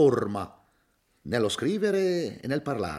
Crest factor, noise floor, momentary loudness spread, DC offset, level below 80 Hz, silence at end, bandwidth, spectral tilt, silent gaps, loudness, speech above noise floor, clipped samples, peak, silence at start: 18 dB; -69 dBFS; 10 LU; under 0.1%; -62 dBFS; 0 s; 14 kHz; -5.5 dB/octave; none; -28 LUFS; 43 dB; under 0.1%; -10 dBFS; 0 s